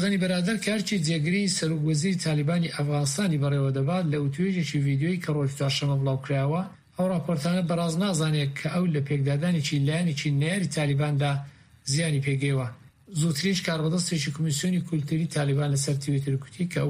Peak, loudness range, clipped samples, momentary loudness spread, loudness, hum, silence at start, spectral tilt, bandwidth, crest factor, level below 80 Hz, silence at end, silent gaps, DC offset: -12 dBFS; 2 LU; under 0.1%; 3 LU; -26 LUFS; none; 0 s; -5.5 dB/octave; 15 kHz; 12 dB; -60 dBFS; 0 s; none; under 0.1%